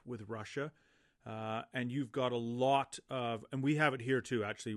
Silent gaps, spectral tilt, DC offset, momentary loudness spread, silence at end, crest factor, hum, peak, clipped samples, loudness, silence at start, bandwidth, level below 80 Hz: none; -5.5 dB/octave; under 0.1%; 12 LU; 0 s; 22 dB; none; -16 dBFS; under 0.1%; -36 LUFS; 0.05 s; 12 kHz; -78 dBFS